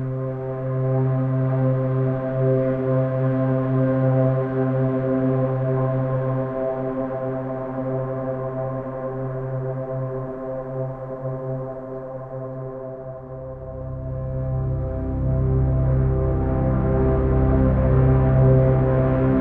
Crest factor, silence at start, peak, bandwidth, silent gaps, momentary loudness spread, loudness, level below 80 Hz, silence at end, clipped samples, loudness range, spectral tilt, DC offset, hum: 14 dB; 0 s; -6 dBFS; 3 kHz; none; 13 LU; -22 LUFS; -32 dBFS; 0 s; under 0.1%; 11 LU; -12.5 dB/octave; under 0.1%; none